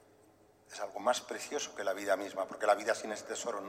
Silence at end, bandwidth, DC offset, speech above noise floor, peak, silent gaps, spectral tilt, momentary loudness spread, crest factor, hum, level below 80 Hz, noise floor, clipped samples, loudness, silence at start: 0 s; 16 kHz; under 0.1%; 29 dB; -14 dBFS; none; -1.5 dB/octave; 9 LU; 22 dB; none; -80 dBFS; -64 dBFS; under 0.1%; -35 LUFS; 0.7 s